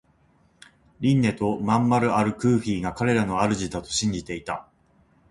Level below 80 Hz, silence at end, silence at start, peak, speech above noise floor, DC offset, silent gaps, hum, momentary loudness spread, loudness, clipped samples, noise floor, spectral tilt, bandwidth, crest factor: -50 dBFS; 0.7 s; 1 s; -6 dBFS; 38 dB; under 0.1%; none; none; 11 LU; -24 LUFS; under 0.1%; -61 dBFS; -5.5 dB/octave; 11.5 kHz; 18 dB